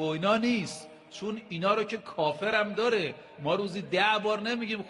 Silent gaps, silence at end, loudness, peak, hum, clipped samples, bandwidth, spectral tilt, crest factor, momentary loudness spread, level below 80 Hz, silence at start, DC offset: none; 0 s; -29 LUFS; -12 dBFS; none; under 0.1%; 11.5 kHz; -5 dB/octave; 18 dB; 11 LU; -70 dBFS; 0 s; under 0.1%